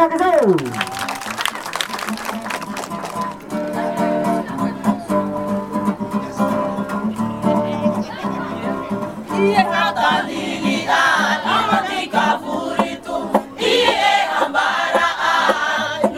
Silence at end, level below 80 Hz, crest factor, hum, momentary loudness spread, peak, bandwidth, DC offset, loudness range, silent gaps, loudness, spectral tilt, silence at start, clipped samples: 0 s; -54 dBFS; 18 dB; none; 10 LU; 0 dBFS; 16.5 kHz; under 0.1%; 6 LU; none; -19 LUFS; -4.5 dB/octave; 0 s; under 0.1%